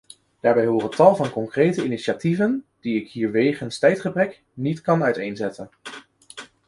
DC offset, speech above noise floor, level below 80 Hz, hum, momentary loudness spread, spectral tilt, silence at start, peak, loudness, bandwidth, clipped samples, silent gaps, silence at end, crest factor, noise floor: under 0.1%; 22 dB; -62 dBFS; none; 21 LU; -6.5 dB/octave; 0.45 s; -2 dBFS; -22 LUFS; 11.5 kHz; under 0.1%; none; 0.25 s; 20 dB; -43 dBFS